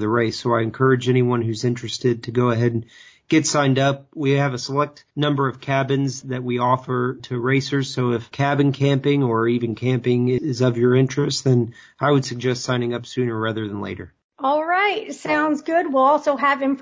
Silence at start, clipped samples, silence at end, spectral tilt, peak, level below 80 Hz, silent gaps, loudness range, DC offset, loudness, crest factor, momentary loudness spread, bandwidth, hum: 0 s; under 0.1%; 0 s; -6 dB/octave; -6 dBFS; -58 dBFS; 14.24-14.29 s; 3 LU; under 0.1%; -20 LUFS; 14 dB; 7 LU; 8 kHz; none